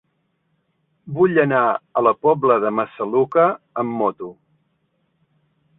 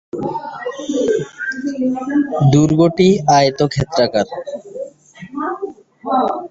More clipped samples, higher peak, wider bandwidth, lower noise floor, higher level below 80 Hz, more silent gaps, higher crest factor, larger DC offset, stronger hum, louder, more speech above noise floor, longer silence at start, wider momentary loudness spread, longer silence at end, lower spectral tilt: neither; about the same, -2 dBFS vs -2 dBFS; second, 4 kHz vs 8 kHz; first, -69 dBFS vs -37 dBFS; second, -64 dBFS vs -48 dBFS; neither; about the same, 18 dB vs 16 dB; neither; neither; about the same, -18 LUFS vs -16 LUFS; first, 51 dB vs 22 dB; first, 1.05 s vs 0.15 s; second, 9 LU vs 17 LU; first, 1.45 s vs 0.05 s; first, -10.5 dB/octave vs -6 dB/octave